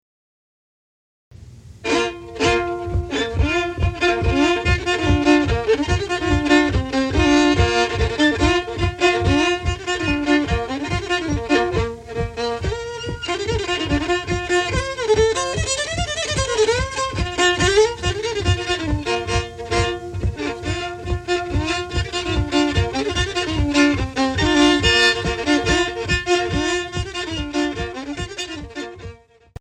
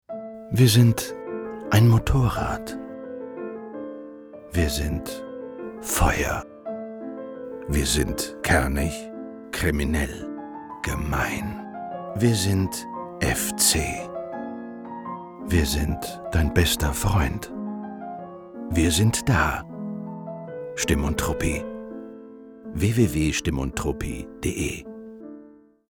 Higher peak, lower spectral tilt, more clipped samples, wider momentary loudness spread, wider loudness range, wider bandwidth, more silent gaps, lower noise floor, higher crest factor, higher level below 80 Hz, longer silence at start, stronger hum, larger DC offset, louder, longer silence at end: about the same, -4 dBFS vs -4 dBFS; about the same, -4.5 dB/octave vs -4.5 dB/octave; neither; second, 10 LU vs 17 LU; about the same, 6 LU vs 4 LU; second, 11 kHz vs 20 kHz; neither; second, -41 dBFS vs -50 dBFS; about the same, 16 dB vs 20 dB; about the same, -30 dBFS vs -34 dBFS; first, 1.4 s vs 0.1 s; neither; neither; first, -20 LUFS vs -24 LUFS; about the same, 0.45 s vs 0.4 s